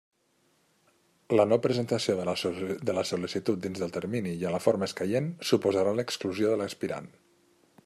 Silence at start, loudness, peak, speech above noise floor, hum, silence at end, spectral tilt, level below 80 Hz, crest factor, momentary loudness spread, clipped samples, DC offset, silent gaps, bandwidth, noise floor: 1.3 s; -29 LUFS; -8 dBFS; 41 dB; none; 0.8 s; -5.5 dB/octave; -72 dBFS; 20 dB; 8 LU; under 0.1%; under 0.1%; none; 14.5 kHz; -70 dBFS